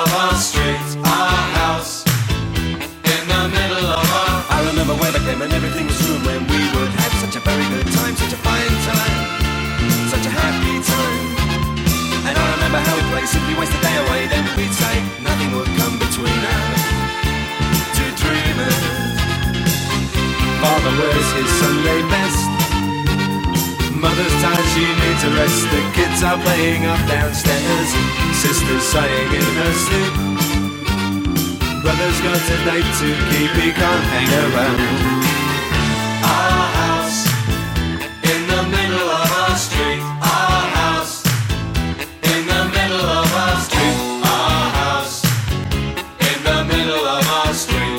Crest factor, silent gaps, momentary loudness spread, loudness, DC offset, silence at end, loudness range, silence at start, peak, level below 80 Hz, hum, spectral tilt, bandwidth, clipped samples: 14 dB; none; 4 LU; -17 LUFS; under 0.1%; 0 s; 2 LU; 0 s; -2 dBFS; -28 dBFS; none; -4 dB/octave; 17 kHz; under 0.1%